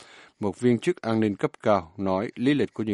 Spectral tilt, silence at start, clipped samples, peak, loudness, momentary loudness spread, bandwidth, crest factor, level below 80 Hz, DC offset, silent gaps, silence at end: -7 dB/octave; 0 s; under 0.1%; -6 dBFS; -26 LUFS; 4 LU; 11.5 kHz; 18 dB; -62 dBFS; under 0.1%; none; 0 s